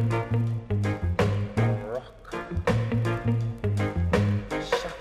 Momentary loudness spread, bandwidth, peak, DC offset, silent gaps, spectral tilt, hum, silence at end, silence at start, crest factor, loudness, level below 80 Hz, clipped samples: 7 LU; 11.5 kHz; -10 dBFS; under 0.1%; none; -7.5 dB/octave; none; 0 s; 0 s; 16 dB; -27 LUFS; -42 dBFS; under 0.1%